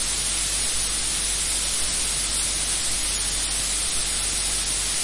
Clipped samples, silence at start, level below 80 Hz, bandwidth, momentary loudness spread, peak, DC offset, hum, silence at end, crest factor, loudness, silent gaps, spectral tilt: under 0.1%; 0 s; -36 dBFS; 11.5 kHz; 1 LU; -10 dBFS; 0.3%; none; 0 s; 14 dB; -21 LUFS; none; 0 dB/octave